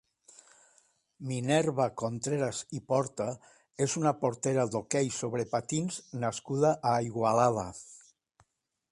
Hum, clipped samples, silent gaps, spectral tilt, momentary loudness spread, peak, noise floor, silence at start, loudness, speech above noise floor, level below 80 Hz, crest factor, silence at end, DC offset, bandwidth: none; under 0.1%; none; -5 dB/octave; 11 LU; -12 dBFS; -74 dBFS; 1.2 s; -30 LUFS; 44 dB; -66 dBFS; 20 dB; 0.95 s; under 0.1%; 11.5 kHz